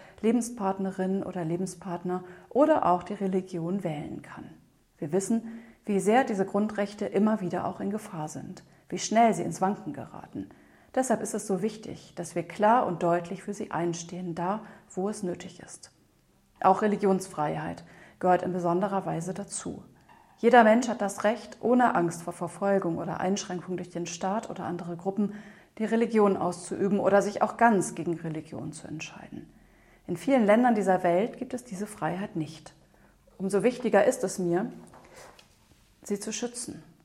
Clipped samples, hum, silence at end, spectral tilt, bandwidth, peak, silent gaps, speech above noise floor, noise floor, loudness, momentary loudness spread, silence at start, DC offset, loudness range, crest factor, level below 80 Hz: under 0.1%; none; 0.2 s; -5.5 dB/octave; 14 kHz; -6 dBFS; none; 37 dB; -64 dBFS; -28 LUFS; 17 LU; 0 s; under 0.1%; 5 LU; 22 dB; -66 dBFS